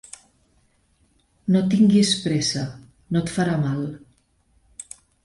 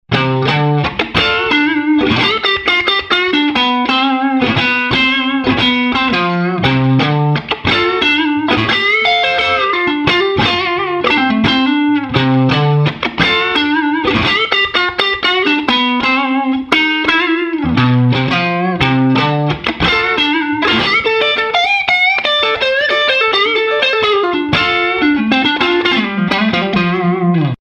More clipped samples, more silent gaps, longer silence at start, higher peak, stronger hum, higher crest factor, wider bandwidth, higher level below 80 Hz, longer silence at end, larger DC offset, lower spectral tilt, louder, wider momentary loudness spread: neither; neither; first, 1.45 s vs 0.1 s; second, -6 dBFS vs 0 dBFS; neither; about the same, 18 dB vs 14 dB; first, 11.5 kHz vs 9.4 kHz; second, -56 dBFS vs -40 dBFS; first, 0.4 s vs 0.15 s; neither; about the same, -5.5 dB/octave vs -6 dB/octave; second, -21 LUFS vs -12 LUFS; first, 25 LU vs 3 LU